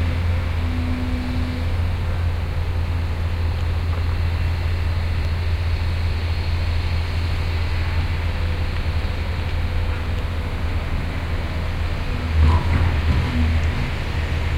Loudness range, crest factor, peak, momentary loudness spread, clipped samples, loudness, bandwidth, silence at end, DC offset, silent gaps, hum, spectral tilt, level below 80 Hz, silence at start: 3 LU; 14 dB; -6 dBFS; 5 LU; under 0.1%; -23 LUFS; 9.6 kHz; 0 s; under 0.1%; none; none; -7 dB/octave; -24 dBFS; 0 s